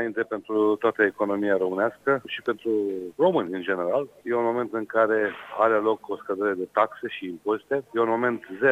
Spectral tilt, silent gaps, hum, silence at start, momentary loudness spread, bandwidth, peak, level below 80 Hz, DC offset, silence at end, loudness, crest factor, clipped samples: -7 dB/octave; none; none; 0 s; 7 LU; 8.4 kHz; -6 dBFS; -72 dBFS; under 0.1%; 0 s; -25 LUFS; 18 dB; under 0.1%